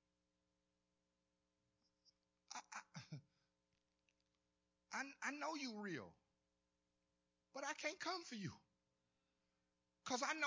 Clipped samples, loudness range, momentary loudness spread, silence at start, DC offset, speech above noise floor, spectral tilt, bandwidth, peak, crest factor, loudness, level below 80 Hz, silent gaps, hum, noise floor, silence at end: under 0.1%; 11 LU; 13 LU; 2.5 s; under 0.1%; 42 dB; -3 dB/octave; 8 kHz; -28 dBFS; 24 dB; -49 LUFS; -90 dBFS; none; 60 Hz at -90 dBFS; -89 dBFS; 0 s